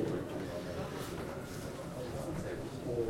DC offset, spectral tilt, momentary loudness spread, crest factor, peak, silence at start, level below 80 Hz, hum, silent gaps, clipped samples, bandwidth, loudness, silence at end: under 0.1%; -6 dB/octave; 4 LU; 16 dB; -22 dBFS; 0 s; -56 dBFS; none; none; under 0.1%; 16.5 kHz; -41 LUFS; 0 s